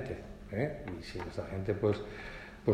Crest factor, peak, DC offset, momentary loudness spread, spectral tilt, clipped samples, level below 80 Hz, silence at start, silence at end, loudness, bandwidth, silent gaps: 20 dB; -16 dBFS; under 0.1%; 12 LU; -7.5 dB/octave; under 0.1%; -52 dBFS; 0 s; 0 s; -37 LUFS; 13.5 kHz; none